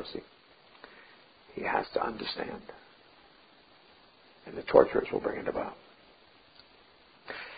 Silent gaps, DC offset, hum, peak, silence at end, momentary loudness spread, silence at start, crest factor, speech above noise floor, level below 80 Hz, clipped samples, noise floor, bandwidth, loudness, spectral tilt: none; under 0.1%; none; -4 dBFS; 0 s; 29 LU; 0 s; 30 dB; 30 dB; -64 dBFS; under 0.1%; -60 dBFS; 4.9 kHz; -31 LUFS; -3 dB/octave